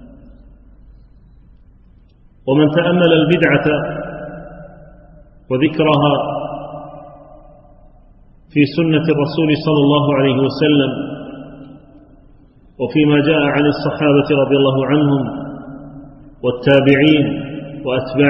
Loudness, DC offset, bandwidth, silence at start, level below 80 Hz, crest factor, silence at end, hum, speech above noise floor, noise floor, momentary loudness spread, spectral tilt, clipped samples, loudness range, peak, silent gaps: -15 LUFS; under 0.1%; 5.8 kHz; 0 s; -46 dBFS; 16 dB; 0 s; none; 33 dB; -47 dBFS; 19 LU; -9.5 dB/octave; under 0.1%; 5 LU; 0 dBFS; none